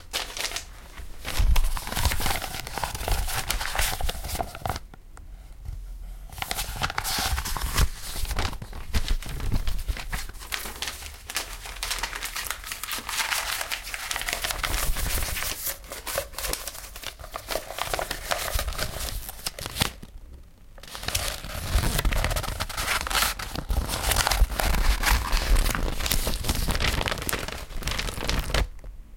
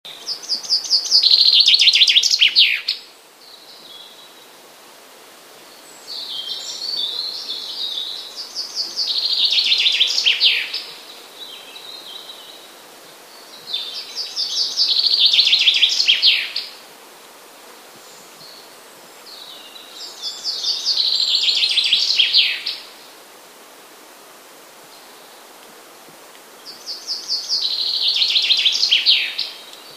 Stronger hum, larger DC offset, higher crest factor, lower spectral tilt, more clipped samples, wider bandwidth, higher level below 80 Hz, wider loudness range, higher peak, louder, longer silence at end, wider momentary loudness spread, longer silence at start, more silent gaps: neither; neither; first, 26 dB vs 20 dB; first, -2.5 dB/octave vs 3 dB/octave; neither; about the same, 17 kHz vs 15.5 kHz; first, -30 dBFS vs -80 dBFS; second, 6 LU vs 19 LU; about the same, 0 dBFS vs 0 dBFS; second, -28 LUFS vs -15 LUFS; about the same, 0 s vs 0 s; second, 12 LU vs 23 LU; about the same, 0 s vs 0.05 s; neither